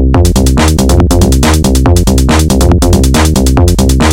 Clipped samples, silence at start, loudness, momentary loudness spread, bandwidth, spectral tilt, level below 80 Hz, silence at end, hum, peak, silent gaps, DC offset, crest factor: 2%; 0 s; -8 LUFS; 1 LU; 17 kHz; -5.5 dB/octave; -10 dBFS; 0 s; none; 0 dBFS; none; 0.7%; 6 dB